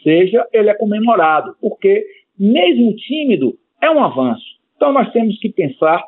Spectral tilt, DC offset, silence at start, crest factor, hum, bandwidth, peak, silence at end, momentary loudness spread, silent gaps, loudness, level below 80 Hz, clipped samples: -11.5 dB/octave; under 0.1%; 0.05 s; 12 dB; none; 4.1 kHz; -2 dBFS; 0 s; 7 LU; none; -14 LUFS; -72 dBFS; under 0.1%